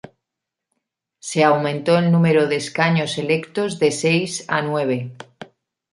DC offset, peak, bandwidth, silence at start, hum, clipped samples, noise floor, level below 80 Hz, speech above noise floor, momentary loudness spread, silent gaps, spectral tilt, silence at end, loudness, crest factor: under 0.1%; -2 dBFS; 11.5 kHz; 1.25 s; none; under 0.1%; -83 dBFS; -64 dBFS; 65 dB; 10 LU; none; -5.5 dB/octave; 0.5 s; -19 LUFS; 18 dB